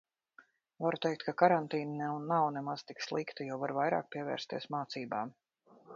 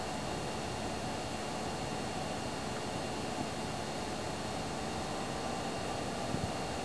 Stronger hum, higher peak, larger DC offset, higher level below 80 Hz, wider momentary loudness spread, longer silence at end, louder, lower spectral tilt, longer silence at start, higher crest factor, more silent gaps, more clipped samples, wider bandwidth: neither; first, -10 dBFS vs -22 dBFS; second, under 0.1% vs 0.3%; second, -82 dBFS vs -54 dBFS; first, 11 LU vs 1 LU; about the same, 0 s vs 0 s; first, -35 LUFS vs -38 LUFS; about the same, -4 dB/octave vs -4 dB/octave; first, 0.4 s vs 0 s; first, 26 dB vs 16 dB; neither; neither; second, 7.4 kHz vs 11 kHz